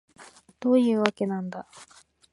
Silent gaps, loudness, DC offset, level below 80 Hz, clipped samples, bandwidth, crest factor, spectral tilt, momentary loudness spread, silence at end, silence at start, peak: none; -25 LUFS; under 0.1%; -74 dBFS; under 0.1%; 11.5 kHz; 26 dB; -6 dB/octave; 18 LU; 0.5 s; 0.2 s; -2 dBFS